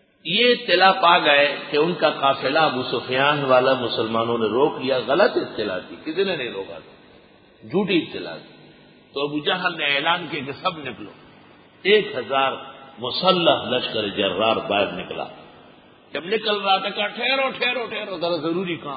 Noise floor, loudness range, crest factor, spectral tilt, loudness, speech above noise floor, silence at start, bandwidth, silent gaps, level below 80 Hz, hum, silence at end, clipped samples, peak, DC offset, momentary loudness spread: -51 dBFS; 8 LU; 20 dB; -9.5 dB/octave; -20 LUFS; 30 dB; 0.25 s; 5 kHz; none; -62 dBFS; none; 0 s; under 0.1%; -2 dBFS; under 0.1%; 15 LU